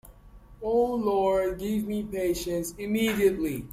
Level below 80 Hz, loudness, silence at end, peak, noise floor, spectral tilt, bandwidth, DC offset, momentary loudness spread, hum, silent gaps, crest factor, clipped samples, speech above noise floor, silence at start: -48 dBFS; -27 LUFS; 0 s; -12 dBFS; -50 dBFS; -5.5 dB/octave; 16 kHz; under 0.1%; 7 LU; none; none; 16 dB; under 0.1%; 24 dB; 0.05 s